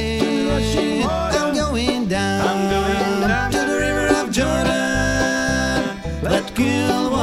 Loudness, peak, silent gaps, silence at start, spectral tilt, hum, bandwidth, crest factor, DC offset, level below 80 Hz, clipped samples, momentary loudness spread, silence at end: -19 LUFS; -2 dBFS; none; 0 s; -4.5 dB/octave; none; 16 kHz; 16 dB; under 0.1%; -32 dBFS; under 0.1%; 2 LU; 0 s